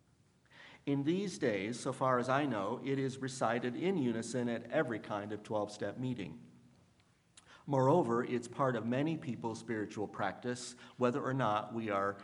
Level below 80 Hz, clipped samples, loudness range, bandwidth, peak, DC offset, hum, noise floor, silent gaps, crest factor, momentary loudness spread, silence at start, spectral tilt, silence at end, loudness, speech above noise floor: -78 dBFS; under 0.1%; 4 LU; 11.5 kHz; -16 dBFS; under 0.1%; none; -69 dBFS; none; 20 dB; 9 LU; 0.55 s; -6 dB/octave; 0 s; -36 LUFS; 34 dB